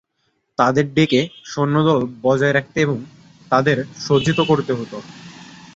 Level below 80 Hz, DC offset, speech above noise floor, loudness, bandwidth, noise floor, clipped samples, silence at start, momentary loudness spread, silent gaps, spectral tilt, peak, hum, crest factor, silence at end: -54 dBFS; under 0.1%; 51 dB; -18 LUFS; 8 kHz; -69 dBFS; under 0.1%; 0.6 s; 14 LU; none; -6 dB/octave; 0 dBFS; none; 18 dB; 0.2 s